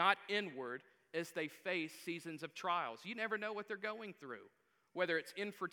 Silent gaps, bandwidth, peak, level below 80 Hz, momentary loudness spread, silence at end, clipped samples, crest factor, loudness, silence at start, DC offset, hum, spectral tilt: none; 19.5 kHz; -16 dBFS; under -90 dBFS; 11 LU; 0.05 s; under 0.1%; 26 dB; -42 LUFS; 0 s; under 0.1%; none; -4 dB/octave